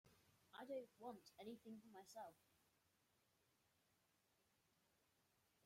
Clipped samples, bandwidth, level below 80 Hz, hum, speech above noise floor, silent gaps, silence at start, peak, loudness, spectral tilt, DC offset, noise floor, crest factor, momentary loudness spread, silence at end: under 0.1%; 16 kHz; under -90 dBFS; none; 26 dB; none; 0.05 s; -42 dBFS; -59 LUFS; -4.5 dB/octave; under 0.1%; -84 dBFS; 20 dB; 8 LU; 2.95 s